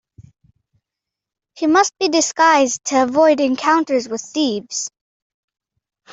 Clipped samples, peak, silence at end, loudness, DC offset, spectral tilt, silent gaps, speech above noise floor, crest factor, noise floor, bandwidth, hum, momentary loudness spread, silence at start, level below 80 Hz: under 0.1%; -2 dBFS; 1.25 s; -16 LUFS; under 0.1%; -2 dB/octave; none; 69 dB; 16 dB; -85 dBFS; 8.2 kHz; none; 11 LU; 1.55 s; -64 dBFS